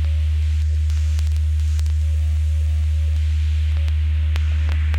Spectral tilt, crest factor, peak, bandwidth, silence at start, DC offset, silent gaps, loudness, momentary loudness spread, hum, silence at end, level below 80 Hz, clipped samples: -6 dB/octave; 12 dB; -6 dBFS; 7.8 kHz; 0 s; under 0.1%; none; -21 LUFS; 0 LU; none; 0 s; -20 dBFS; under 0.1%